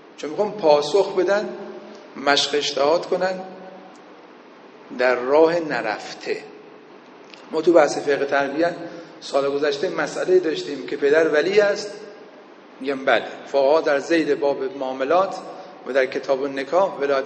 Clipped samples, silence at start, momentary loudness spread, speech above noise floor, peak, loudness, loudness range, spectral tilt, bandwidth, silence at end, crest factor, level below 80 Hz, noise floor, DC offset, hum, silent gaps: under 0.1%; 0.2 s; 17 LU; 25 dB; -2 dBFS; -21 LUFS; 3 LU; -4 dB/octave; 9.2 kHz; 0 s; 20 dB; -72 dBFS; -45 dBFS; under 0.1%; none; none